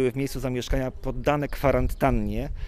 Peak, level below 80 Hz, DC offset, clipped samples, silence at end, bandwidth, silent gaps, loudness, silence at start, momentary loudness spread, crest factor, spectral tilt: -6 dBFS; -32 dBFS; under 0.1%; under 0.1%; 0 s; 16 kHz; none; -26 LUFS; 0 s; 6 LU; 18 dB; -6.5 dB/octave